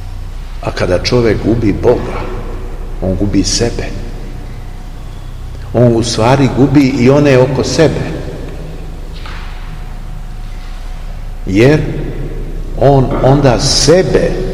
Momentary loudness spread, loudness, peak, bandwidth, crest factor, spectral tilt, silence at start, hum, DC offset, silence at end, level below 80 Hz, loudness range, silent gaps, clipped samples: 20 LU; -11 LUFS; 0 dBFS; 13 kHz; 12 dB; -5.5 dB/octave; 0 s; none; 0.8%; 0 s; -22 dBFS; 8 LU; none; 0.9%